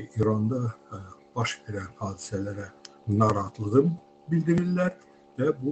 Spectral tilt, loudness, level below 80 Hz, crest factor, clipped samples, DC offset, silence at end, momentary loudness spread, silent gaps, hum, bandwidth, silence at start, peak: -7 dB/octave; -28 LUFS; -60 dBFS; 20 dB; under 0.1%; under 0.1%; 0 s; 16 LU; none; none; 8.6 kHz; 0 s; -8 dBFS